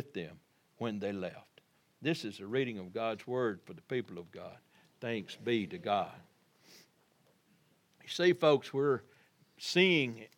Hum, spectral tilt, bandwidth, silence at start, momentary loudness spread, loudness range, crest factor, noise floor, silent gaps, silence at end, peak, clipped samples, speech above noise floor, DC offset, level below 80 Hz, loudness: none; -5.5 dB/octave; 16 kHz; 0 s; 17 LU; 7 LU; 24 dB; -70 dBFS; none; 0.1 s; -12 dBFS; under 0.1%; 36 dB; under 0.1%; -86 dBFS; -34 LUFS